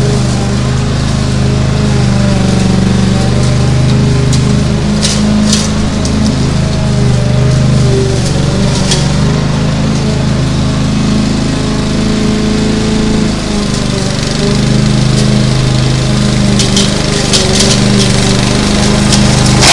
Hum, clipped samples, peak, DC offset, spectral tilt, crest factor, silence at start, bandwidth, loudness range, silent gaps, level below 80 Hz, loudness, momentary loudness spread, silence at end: none; 0.2%; 0 dBFS; under 0.1%; -5 dB/octave; 10 dB; 0 s; 11.5 kHz; 3 LU; none; -20 dBFS; -10 LUFS; 4 LU; 0 s